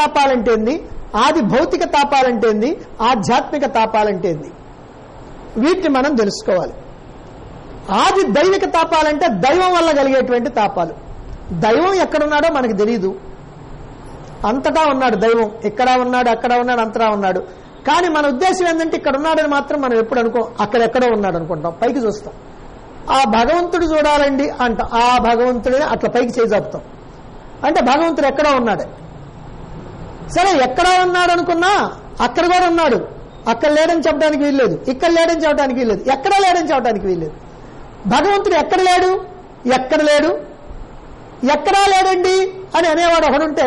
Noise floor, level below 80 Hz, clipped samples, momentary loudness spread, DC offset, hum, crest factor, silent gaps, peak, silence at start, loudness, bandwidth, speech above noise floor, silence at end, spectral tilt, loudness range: -37 dBFS; -38 dBFS; under 0.1%; 14 LU; under 0.1%; none; 10 dB; none; -4 dBFS; 0 s; -15 LUFS; 11.5 kHz; 23 dB; 0 s; -4.5 dB/octave; 3 LU